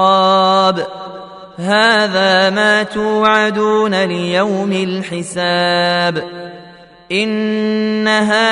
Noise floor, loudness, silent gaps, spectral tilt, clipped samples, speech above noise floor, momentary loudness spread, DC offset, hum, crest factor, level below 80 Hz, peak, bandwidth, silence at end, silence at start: -40 dBFS; -14 LUFS; none; -4.5 dB/octave; under 0.1%; 26 dB; 14 LU; under 0.1%; none; 14 dB; -56 dBFS; 0 dBFS; 11 kHz; 0 s; 0 s